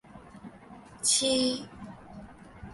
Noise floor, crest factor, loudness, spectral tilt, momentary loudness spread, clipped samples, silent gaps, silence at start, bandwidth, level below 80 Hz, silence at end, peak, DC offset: -50 dBFS; 20 dB; -26 LUFS; -2 dB/octave; 25 LU; under 0.1%; none; 0.1 s; 12 kHz; -58 dBFS; 0 s; -12 dBFS; under 0.1%